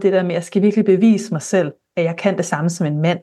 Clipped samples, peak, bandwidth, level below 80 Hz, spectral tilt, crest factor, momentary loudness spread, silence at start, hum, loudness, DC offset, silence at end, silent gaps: under 0.1%; -2 dBFS; 12.5 kHz; -70 dBFS; -6.5 dB/octave; 14 dB; 7 LU; 0 s; none; -18 LUFS; under 0.1%; 0.05 s; none